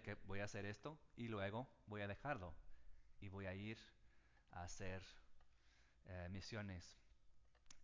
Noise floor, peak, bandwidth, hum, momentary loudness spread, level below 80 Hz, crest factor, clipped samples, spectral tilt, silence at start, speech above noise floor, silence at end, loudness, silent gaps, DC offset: -72 dBFS; -32 dBFS; 7.6 kHz; none; 14 LU; -66 dBFS; 20 dB; under 0.1%; -5.5 dB/octave; 0 s; 21 dB; 0 s; -52 LUFS; none; under 0.1%